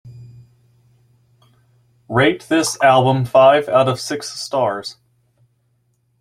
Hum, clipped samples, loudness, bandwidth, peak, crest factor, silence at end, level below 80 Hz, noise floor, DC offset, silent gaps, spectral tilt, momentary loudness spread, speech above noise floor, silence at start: none; under 0.1%; -16 LUFS; 15 kHz; -2 dBFS; 18 dB; 1.3 s; -56 dBFS; -64 dBFS; under 0.1%; none; -5 dB/octave; 13 LU; 48 dB; 0.05 s